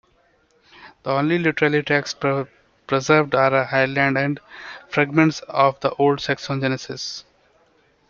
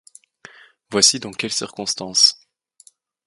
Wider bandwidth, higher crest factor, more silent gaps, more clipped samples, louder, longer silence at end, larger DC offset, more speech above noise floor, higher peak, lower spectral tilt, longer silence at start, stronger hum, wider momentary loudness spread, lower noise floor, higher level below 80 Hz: second, 7.4 kHz vs 12 kHz; about the same, 20 dB vs 22 dB; neither; neither; second, -20 LUFS vs -17 LUFS; about the same, 0.9 s vs 0.9 s; neither; first, 41 dB vs 34 dB; about the same, -2 dBFS vs 0 dBFS; first, -5.5 dB/octave vs -1 dB/octave; about the same, 0.8 s vs 0.9 s; neither; about the same, 13 LU vs 11 LU; first, -61 dBFS vs -54 dBFS; about the same, -60 dBFS vs -64 dBFS